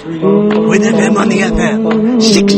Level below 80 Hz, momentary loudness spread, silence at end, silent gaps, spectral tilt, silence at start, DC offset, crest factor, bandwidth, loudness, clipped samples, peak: -32 dBFS; 3 LU; 0 s; none; -5 dB/octave; 0 s; under 0.1%; 10 dB; 8.8 kHz; -10 LUFS; 0.1%; 0 dBFS